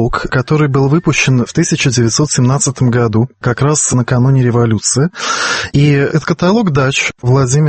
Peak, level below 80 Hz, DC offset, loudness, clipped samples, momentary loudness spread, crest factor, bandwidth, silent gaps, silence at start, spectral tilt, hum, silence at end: 0 dBFS; -36 dBFS; under 0.1%; -12 LUFS; under 0.1%; 3 LU; 12 dB; 8.8 kHz; none; 0 s; -5 dB/octave; none; 0 s